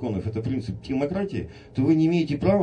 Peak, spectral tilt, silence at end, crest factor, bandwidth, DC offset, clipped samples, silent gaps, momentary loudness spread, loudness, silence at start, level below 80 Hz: -8 dBFS; -8.5 dB/octave; 0 s; 16 dB; 8.8 kHz; under 0.1%; under 0.1%; none; 10 LU; -25 LUFS; 0 s; -50 dBFS